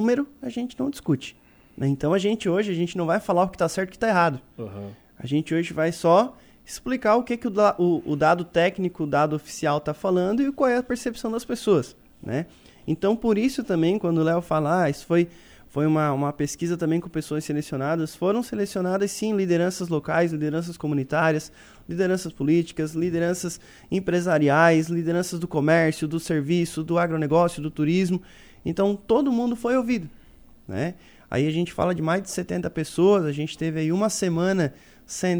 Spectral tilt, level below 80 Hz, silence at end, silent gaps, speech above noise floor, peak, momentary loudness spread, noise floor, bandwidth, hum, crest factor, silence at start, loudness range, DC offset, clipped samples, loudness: -6 dB/octave; -54 dBFS; 0 s; none; 27 dB; -6 dBFS; 9 LU; -50 dBFS; over 20 kHz; none; 18 dB; 0 s; 3 LU; under 0.1%; under 0.1%; -24 LUFS